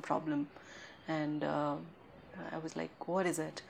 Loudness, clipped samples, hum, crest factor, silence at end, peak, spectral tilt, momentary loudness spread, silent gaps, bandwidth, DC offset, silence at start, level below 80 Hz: -38 LUFS; under 0.1%; none; 20 dB; 0 s; -18 dBFS; -5.5 dB/octave; 17 LU; none; 16 kHz; under 0.1%; 0 s; -76 dBFS